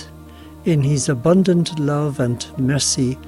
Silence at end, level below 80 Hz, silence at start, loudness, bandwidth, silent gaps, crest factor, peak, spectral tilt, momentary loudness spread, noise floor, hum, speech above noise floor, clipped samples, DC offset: 0 s; -46 dBFS; 0 s; -18 LUFS; 13 kHz; none; 14 dB; -4 dBFS; -5.5 dB/octave; 7 LU; -39 dBFS; none; 21 dB; under 0.1%; under 0.1%